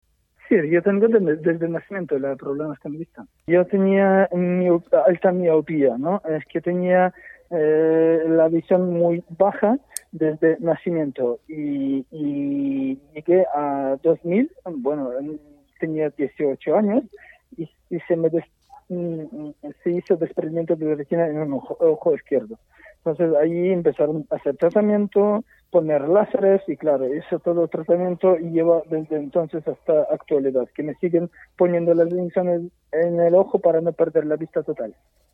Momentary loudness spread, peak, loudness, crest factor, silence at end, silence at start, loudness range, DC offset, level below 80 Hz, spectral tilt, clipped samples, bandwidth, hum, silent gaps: 11 LU; -4 dBFS; -21 LUFS; 16 dB; 0.45 s; 0.5 s; 5 LU; under 0.1%; -64 dBFS; -8.5 dB/octave; under 0.1%; 12.5 kHz; none; none